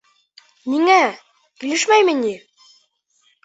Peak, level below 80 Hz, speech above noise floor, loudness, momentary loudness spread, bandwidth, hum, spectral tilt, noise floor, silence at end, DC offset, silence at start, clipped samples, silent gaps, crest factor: -2 dBFS; -70 dBFS; 46 dB; -17 LUFS; 17 LU; 8.4 kHz; none; -2 dB/octave; -63 dBFS; 1.1 s; under 0.1%; 0.65 s; under 0.1%; none; 18 dB